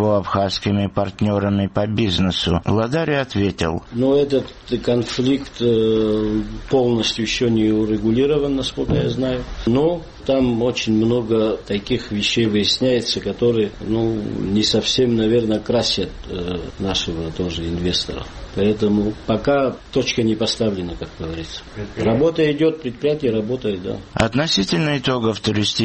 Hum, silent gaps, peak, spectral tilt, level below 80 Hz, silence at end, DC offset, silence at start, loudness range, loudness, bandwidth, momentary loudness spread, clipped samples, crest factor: none; none; 0 dBFS; -5.5 dB/octave; -38 dBFS; 0 s; under 0.1%; 0 s; 3 LU; -19 LUFS; 8.8 kHz; 8 LU; under 0.1%; 18 dB